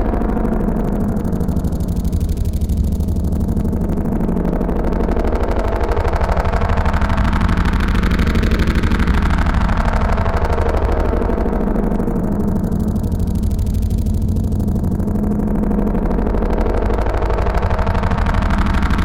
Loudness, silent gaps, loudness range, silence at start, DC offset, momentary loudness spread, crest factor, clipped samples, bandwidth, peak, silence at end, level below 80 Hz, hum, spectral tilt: -18 LUFS; none; 2 LU; 0 s; under 0.1%; 3 LU; 14 dB; under 0.1%; 16 kHz; -2 dBFS; 0 s; -18 dBFS; none; -8 dB/octave